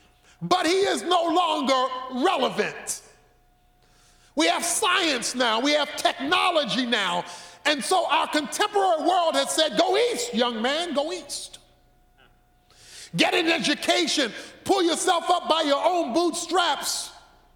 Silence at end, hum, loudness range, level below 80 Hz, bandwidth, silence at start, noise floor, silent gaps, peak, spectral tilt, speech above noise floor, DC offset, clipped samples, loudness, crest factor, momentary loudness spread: 0.35 s; none; 4 LU; -64 dBFS; 18 kHz; 0.4 s; -60 dBFS; none; -4 dBFS; -2 dB/octave; 37 dB; under 0.1%; under 0.1%; -23 LUFS; 20 dB; 9 LU